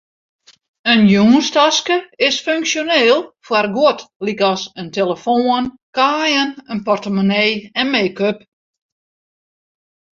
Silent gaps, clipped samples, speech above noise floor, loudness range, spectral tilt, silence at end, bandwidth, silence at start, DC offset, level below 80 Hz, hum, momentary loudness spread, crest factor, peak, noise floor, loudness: 4.16-4.20 s, 5.83-5.93 s; under 0.1%; over 75 dB; 5 LU; -4 dB/octave; 1.8 s; 7.6 kHz; 0.85 s; under 0.1%; -58 dBFS; none; 10 LU; 16 dB; 0 dBFS; under -90 dBFS; -15 LUFS